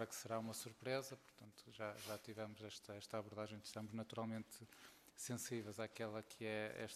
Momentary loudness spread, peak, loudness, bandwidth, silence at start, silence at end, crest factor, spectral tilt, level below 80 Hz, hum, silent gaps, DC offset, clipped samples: 13 LU; -28 dBFS; -49 LUFS; 14.5 kHz; 0 s; 0 s; 20 dB; -4 dB/octave; -84 dBFS; none; none; under 0.1%; under 0.1%